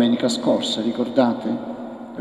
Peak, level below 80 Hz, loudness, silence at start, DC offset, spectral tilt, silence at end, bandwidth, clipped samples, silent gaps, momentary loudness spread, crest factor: -4 dBFS; -64 dBFS; -21 LUFS; 0 s; under 0.1%; -5 dB/octave; 0 s; 12 kHz; under 0.1%; none; 13 LU; 16 dB